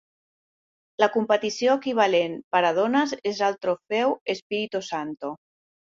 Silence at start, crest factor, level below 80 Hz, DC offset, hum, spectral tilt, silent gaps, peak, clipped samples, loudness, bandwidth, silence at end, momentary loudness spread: 1 s; 20 dB; -72 dBFS; under 0.1%; none; -4 dB/octave; 2.44-2.51 s, 4.21-4.26 s, 4.42-4.50 s; -6 dBFS; under 0.1%; -24 LUFS; 7.6 kHz; 0.55 s; 11 LU